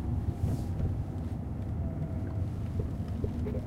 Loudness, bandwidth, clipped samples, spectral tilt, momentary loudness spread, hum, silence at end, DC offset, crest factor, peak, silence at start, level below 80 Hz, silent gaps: -35 LUFS; 12.5 kHz; under 0.1%; -9.5 dB/octave; 4 LU; none; 0 s; under 0.1%; 14 dB; -18 dBFS; 0 s; -40 dBFS; none